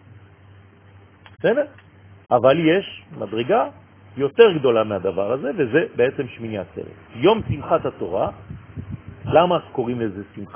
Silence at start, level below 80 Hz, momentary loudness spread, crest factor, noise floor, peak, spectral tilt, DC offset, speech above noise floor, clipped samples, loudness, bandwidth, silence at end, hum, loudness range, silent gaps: 0.15 s; -50 dBFS; 19 LU; 20 dB; -48 dBFS; 0 dBFS; -10.5 dB/octave; under 0.1%; 29 dB; under 0.1%; -20 LUFS; 3.6 kHz; 0.05 s; none; 4 LU; none